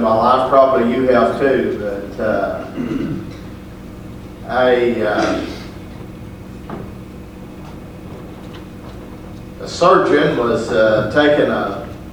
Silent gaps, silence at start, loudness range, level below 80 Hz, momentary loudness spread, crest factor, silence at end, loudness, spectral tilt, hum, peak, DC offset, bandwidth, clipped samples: none; 0 s; 17 LU; -40 dBFS; 21 LU; 18 dB; 0 s; -15 LUFS; -6 dB/octave; none; 0 dBFS; under 0.1%; 19.5 kHz; under 0.1%